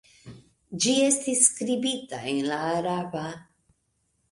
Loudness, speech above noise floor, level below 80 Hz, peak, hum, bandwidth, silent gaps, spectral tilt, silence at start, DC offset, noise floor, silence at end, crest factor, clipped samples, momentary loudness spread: -24 LUFS; 47 dB; -66 dBFS; -4 dBFS; none; 11.5 kHz; none; -2.5 dB/octave; 0.25 s; under 0.1%; -73 dBFS; 0.9 s; 22 dB; under 0.1%; 15 LU